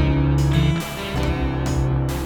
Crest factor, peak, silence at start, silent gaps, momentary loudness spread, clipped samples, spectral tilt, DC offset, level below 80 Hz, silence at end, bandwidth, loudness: 14 dB; -6 dBFS; 0 s; none; 6 LU; under 0.1%; -6.5 dB/octave; under 0.1%; -26 dBFS; 0 s; 18.5 kHz; -21 LUFS